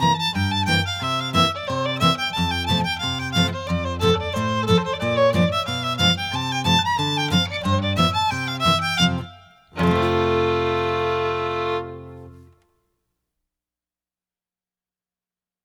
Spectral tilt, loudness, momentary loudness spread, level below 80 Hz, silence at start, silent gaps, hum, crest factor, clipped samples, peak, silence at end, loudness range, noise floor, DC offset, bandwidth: -5 dB/octave; -21 LUFS; 6 LU; -46 dBFS; 0 s; none; none; 18 dB; under 0.1%; -4 dBFS; 3.25 s; 6 LU; under -90 dBFS; under 0.1%; 19 kHz